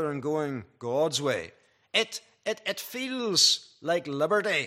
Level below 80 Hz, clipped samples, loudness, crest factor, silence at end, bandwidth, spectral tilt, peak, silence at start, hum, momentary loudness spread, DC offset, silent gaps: -76 dBFS; under 0.1%; -27 LUFS; 20 dB; 0 s; 15.5 kHz; -2.5 dB/octave; -10 dBFS; 0 s; none; 13 LU; under 0.1%; none